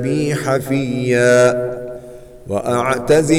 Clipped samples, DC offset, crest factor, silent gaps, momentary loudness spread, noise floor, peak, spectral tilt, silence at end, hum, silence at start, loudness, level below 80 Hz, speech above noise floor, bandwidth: under 0.1%; under 0.1%; 14 dB; none; 17 LU; -36 dBFS; -2 dBFS; -5.5 dB/octave; 0 s; none; 0 s; -16 LUFS; -44 dBFS; 20 dB; 16.5 kHz